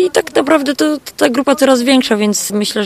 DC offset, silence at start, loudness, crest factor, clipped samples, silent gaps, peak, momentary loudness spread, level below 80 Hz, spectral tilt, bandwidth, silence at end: under 0.1%; 0 s; -13 LUFS; 12 dB; under 0.1%; none; 0 dBFS; 5 LU; -54 dBFS; -3.5 dB/octave; 15.5 kHz; 0 s